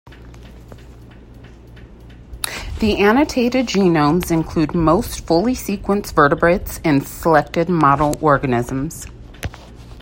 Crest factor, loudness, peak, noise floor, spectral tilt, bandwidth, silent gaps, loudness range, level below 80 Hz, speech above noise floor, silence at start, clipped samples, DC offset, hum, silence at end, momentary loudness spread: 18 dB; -17 LUFS; 0 dBFS; -40 dBFS; -6 dB/octave; 16.5 kHz; none; 4 LU; -36 dBFS; 24 dB; 0.05 s; under 0.1%; under 0.1%; none; 0 s; 13 LU